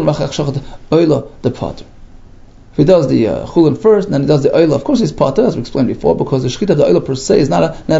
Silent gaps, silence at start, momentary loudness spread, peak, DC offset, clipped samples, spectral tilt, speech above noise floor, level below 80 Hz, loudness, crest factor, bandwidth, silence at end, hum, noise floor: none; 0 s; 9 LU; 0 dBFS; under 0.1%; under 0.1%; -7 dB/octave; 25 dB; -36 dBFS; -13 LUFS; 12 dB; 8 kHz; 0 s; none; -38 dBFS